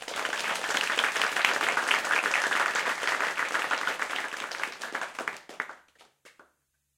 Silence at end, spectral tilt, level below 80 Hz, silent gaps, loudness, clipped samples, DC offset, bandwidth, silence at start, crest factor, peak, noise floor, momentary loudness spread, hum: 0.7 s; 0.5 dB/octave; -80 dBFS; none; -28 LUFS; under 0.1%; under 0.1%; 17 kHz; 0 s; 26 dB; -4 dBFS; -74 dBFS; 11 LU; none